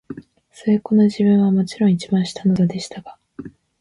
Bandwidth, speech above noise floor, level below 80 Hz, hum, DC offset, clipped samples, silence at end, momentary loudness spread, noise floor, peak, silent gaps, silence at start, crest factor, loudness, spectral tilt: 11 kHz; 25 dB; -56 dBFS; none; under 0.1%; under 0.1%; 0.3 s; 22 LU; -42 dBFS; -6 dBFS; none; 0.1 s; 14 dB; -18 LUFS; -7.5 dB/octave